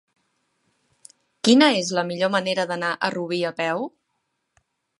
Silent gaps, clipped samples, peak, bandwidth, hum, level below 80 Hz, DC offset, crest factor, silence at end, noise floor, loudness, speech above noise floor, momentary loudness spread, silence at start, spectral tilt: none; under 0.1%; -2 dBFS; 11.5 kHz; none; -74 dBFS; under 0.1%; 22 dB; 1.1 s; -75 dBFS; -21 LUFS; 54 dB; 10 LU; 1.45 s; -4 dB/octave